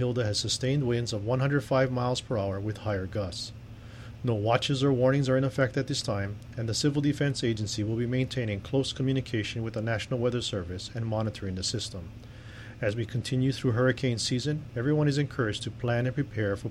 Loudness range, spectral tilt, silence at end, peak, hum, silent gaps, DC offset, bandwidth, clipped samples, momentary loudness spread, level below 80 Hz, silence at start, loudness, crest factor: 4 LU; -5.5 dB/octave; 0 s; -10 dBFS; none; none; under 0.1%; 12.5 kHz; under 0.1%; 9 LU; -52 dBFS; 0 s; -29 LUFS; 18 dB